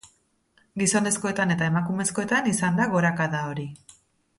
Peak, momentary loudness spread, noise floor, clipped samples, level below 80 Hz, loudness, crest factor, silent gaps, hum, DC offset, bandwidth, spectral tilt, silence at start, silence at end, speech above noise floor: -10 dBFS; 9 LU; -65 dBFS; under 0.1%; -60 dBFS; -24 LUFS; 16 dB; none; none; under 0.1%; 12 kHz; -4.5 dB/octave; 0.05 s; 0.6 s; 41 dB